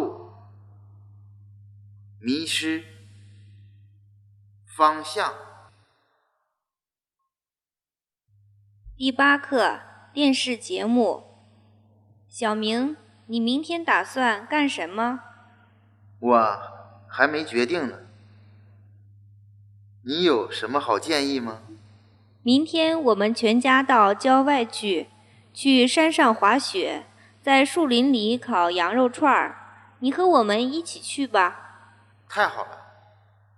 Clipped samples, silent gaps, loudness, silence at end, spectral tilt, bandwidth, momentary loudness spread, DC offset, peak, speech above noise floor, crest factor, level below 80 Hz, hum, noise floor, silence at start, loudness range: under 0.1%; none; -22 LUFS; 0.8 s; -3.5 dB/octave; 12.5 kHz; 15 LU; under 0.1%; -2 dBFS; over 68 dB; 22 dB; -66 dBFS; none; under -90 dBFS; 0 s; 9 LU